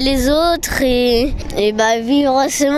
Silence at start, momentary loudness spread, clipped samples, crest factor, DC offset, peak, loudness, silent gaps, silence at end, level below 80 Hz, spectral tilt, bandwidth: 0 s; 4 LU; under 0.1%; 12 dB; under 0.1%; -2 dBFS; -15 LUFS; none; 0 s; -28 dBFS; -3.5 dB/octave; 16 kHz